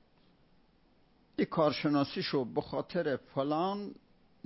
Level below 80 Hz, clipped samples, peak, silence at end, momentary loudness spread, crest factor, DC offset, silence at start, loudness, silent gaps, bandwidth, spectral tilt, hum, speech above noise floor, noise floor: -68 dBFS; under 0.1%; -14 dBFS; 0.5 s; 7 LU; 20 dB; under 0.1%; 1.4 s; -33 LUFS; none; 5.8 kHz; -9.5 dB/octave; none; 34 dB; -66 dBFS